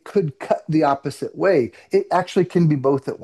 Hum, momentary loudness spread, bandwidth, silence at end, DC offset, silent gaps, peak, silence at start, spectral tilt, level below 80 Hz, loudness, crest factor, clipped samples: none; 6 LU; 12.5 kHz; 0 s; under 0.1%; none; -6 dBFS; 0.05 s; -7.5 dB/octave; -64 dBFS; -20 LUFS; 14 dB; under 0.1%